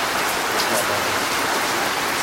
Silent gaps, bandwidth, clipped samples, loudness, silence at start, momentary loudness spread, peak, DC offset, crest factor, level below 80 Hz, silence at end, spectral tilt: none; 16 kHz; under 0.1%; -20 LUFS; 0 s; 1 LU; -6 dBFS; under 0.1%; 16 dB; -52 dBFS; 0 s; -1.5 dB/octave